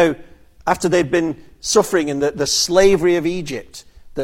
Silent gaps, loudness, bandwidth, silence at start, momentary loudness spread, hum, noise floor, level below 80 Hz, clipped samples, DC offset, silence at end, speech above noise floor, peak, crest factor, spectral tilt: none; -17 LUFS; 16.5 kHz; 0 s; 15 LU; none; -42 dBFS; -42 dBFS; under 0.1%; under 0.1%; 0 s; 25 dB; 0 dBFS; 16 dB; -3.5 dB/octave